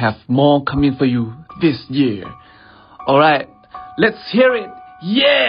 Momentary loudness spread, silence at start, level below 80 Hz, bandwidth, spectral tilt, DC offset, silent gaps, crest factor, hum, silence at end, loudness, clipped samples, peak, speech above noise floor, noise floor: 17 LU; 0 s; -46 dBFS; 5.2 kHz; -10.5 dB/octave; under 0.1%; none; 16 dB; none; 0 s; -16 LUFS; under 0.1%; 0 dBFS; 29 dB; -44 dBFS